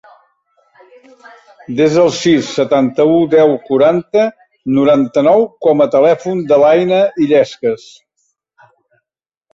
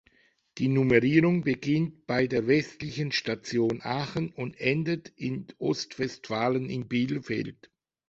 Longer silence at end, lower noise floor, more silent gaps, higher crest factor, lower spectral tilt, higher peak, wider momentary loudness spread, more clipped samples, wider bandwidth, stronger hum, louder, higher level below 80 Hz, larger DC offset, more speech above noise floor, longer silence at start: first, 1.8 s vs 0.6 s; first, -83 dBFS vs -65 dBFS; neither; second, 12 dB vs 22 dB; about the same, -6 dB/octave vs -6.5 dB/octave; first, -2 dBFS vs -6 dBFS; second, 7 LU vs 11 LU; neither; about the same, 7.8 kHz vs 8 kHz; neither; first, -12 LUFS vs -28 LUFS; about the same, -56 dBFS vs -60 dBFS; neither; first, 71 dB vs 38 dB; first, 1.7 s vs 0.55 s